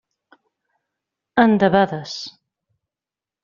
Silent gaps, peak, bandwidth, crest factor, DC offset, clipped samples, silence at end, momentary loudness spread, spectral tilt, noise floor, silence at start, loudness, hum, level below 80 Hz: none; -2 dBFS; 7.4 kHz; 20 dB; under 0.1%; under 0.1%; 1.15 s; 16 LU; -4.5 dB/octave; -89 dBFS; 1.35 s; -17 LUFS; none; -58 dBFS